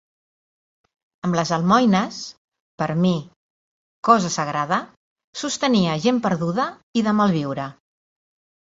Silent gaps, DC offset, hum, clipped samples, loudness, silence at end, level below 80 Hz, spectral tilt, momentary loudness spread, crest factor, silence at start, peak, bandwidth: 2.38-2.52 s, 2.60-2.78 s, 3.36-4.03 s, 4.97-5.16 s, 5.24-5.33 s, 6.83-6.93 s; under 0.1%; none; under 0.1%; -21 LUFS; 0.95 s; -60 dBFS; -5.5 dB/octave; 12 LU; 20 dB; 1.25 s; -2 dBFS; 8 kHz